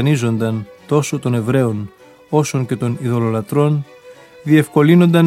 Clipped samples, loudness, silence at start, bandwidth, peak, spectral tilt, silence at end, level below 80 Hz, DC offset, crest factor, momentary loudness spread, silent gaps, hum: under 0.1%; -17 LUFS; 0 s; 15 kHz; 0 dBFS; -7 dB/octave; 0 s; -58 dBFS; under 0.1%; 16 dB; 12 LU; none; none